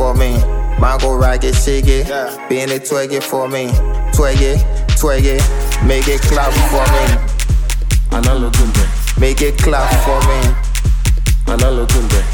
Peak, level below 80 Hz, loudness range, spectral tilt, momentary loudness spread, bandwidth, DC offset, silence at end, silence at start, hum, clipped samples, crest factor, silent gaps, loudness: 0 dBFS; -14 dBFS; 2 LU; -5 dB/octave; 4 LU; 18.5 kHz; under 0.1%; 0 s; 0 s; none; under 0.1%; 12 dB; none; -14 LUFS